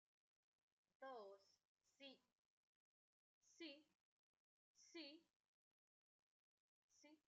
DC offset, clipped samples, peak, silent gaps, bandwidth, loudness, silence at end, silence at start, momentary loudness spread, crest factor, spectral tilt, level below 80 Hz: under 0.1%; under 0.1%; -46 dBFS; 1.65-1.76 s, 2.32-3.41 s, 3.95-4.75 s, 5.30-6.89 s; 7.4 kHz; -62 LUFS; 0.1 s; 1 s; 6 LU; 22 dB; 0.5 dB/octave; under -90 dBFS